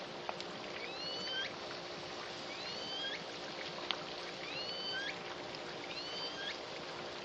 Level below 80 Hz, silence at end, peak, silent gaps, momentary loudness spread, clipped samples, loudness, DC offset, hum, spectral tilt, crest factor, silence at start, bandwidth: -74 dBFS; 0 s; -14 dBFS; none; 5 LU; under 0.1%; -41 LUFS; under 0.1%; none; -2.5 dB/octave; 30 dB; 0 s; 10 kHz